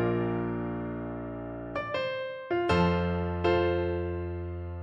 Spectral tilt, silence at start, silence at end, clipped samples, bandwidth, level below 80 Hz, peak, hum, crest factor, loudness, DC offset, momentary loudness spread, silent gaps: -8 dB/octave; 0 s; 0 s; under 0.1%; 8 kHz; -46 dBFS; -12 dBFS; none; 18 dB; -30 LUFS; under 0.1%; 11 LU; none